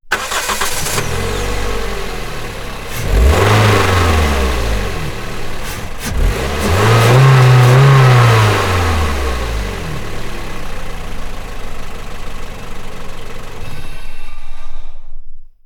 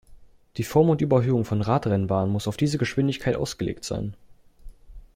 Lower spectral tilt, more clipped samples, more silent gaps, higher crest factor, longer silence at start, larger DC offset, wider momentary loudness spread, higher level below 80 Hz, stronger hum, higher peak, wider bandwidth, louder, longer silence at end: second, -5 dB/octave vs -7 dB/octave; neither; neither; second, 12 dB vs 18 dB; about the same, 0.05 s vs 0.1 s; neither; first, 22 LU vs 11 LU; first, -22 dBFS vs -48 dBFS; neither; first, 0 dBFS vs -6 dBFS; first, 19 kHz vs 16.5 kHz; first, -13 LUFS vs -24 LUFS; about the same, 0.2 s vs 0.15 s